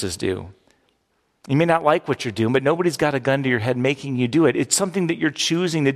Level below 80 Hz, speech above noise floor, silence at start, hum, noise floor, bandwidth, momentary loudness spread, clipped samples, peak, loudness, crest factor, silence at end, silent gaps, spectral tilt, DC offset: -52 dBFS; 48 dB; 0 s; none; -68 dBFS; 14.5 kHz; 6 LU; under 0.1%; -4 dBFS; -20 LUFS; 18 dB; 0 s; none; -4.5 dB/octave; under 0.1%